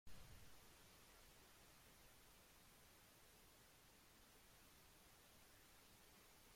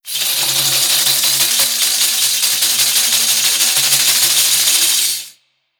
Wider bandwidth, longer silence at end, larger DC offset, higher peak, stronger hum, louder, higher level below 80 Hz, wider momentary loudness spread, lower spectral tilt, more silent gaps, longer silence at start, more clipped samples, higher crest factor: second, 16.5 kHz vs over 20 kHz; second, 0 s vs 0.5 s; neither; second, -46 dBFS vs 0 dBFS; neither; second, -68 LUFS vs -11 LUFS; second, -76 dBFS vs -70 dBFS; about the same, 2 LU vs 3 LU; first, -2.5 dB/octave vs 2 dB/octave; neither; about the same, 0.05 s vs 0.05 s; neither; first, 20 dB vs 14 dB